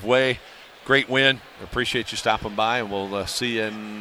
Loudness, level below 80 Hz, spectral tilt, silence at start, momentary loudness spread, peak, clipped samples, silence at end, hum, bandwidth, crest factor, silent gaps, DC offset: -23 LUFS; -50 dBFS; -3.5 dB/octave; 0 s; 10 LU; -4 dBFS; under 0.1%; 0 s; none; 16 kHz; 20 dB; none; under 0.1%